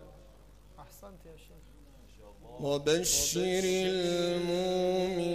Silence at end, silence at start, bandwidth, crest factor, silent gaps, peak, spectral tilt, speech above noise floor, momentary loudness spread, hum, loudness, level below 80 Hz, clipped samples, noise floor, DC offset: 0 s; 0 s; 15.5 kHz; 16 dB; none; -16 dBFS; -3.5 dB/octave; 25 dB; 24 LU; none; -29 LUFS; -54 dBFS; under 0.1%; -56 dBFS; under 0.1%